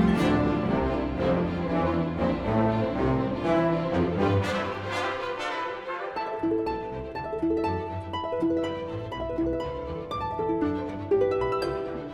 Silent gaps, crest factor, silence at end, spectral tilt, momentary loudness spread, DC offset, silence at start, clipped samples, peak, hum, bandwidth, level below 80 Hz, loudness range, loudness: none; 16 dB; 0 s; -7.5 dB/octave; 8 LU; under 0.1%; 0 s; under 0.1%; -10 dBFS; none; 12 kHz; -44 dBFS; 4 LU; -28 LUFS